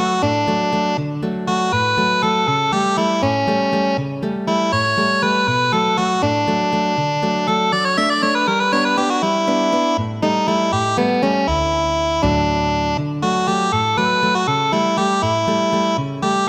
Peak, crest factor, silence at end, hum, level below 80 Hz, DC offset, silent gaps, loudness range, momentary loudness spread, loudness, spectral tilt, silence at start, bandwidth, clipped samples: -4 dBFS; 14 dB; 0 s; none; -38 dBFS; under 0.1%; none; 1 LU; 3 LU; -18 LUFS; -5 dB/octave; 0 s; 18.5 kHz; under 0.1%